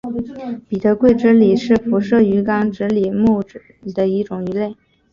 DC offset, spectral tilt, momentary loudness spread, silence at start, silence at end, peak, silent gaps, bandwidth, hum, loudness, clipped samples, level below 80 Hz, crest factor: under 0.1%; -8.5 dB/octave; 14 LU; 0.05 s; 0.4 s; -2 dBFS; none; 7.2 kHz; none; -16 LUFS; under 0.1%; -48 dBFS; 14 dB